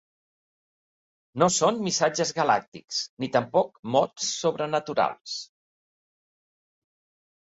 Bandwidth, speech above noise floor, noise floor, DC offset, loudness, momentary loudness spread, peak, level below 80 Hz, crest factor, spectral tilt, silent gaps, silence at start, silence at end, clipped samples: 8 kHz; over 65 dB; under -90 dBFS; under 0.1%; -25 LUFS; 8 LU; -6 dBFS; -70 dBFS; 22 dB; -3.5 dB/octave; 2.68-2.72 s, 3.09-3.17 s, 3.79-3.83 s, 5.21-5.25 s; 1.35 s; 2 s; under 0.1%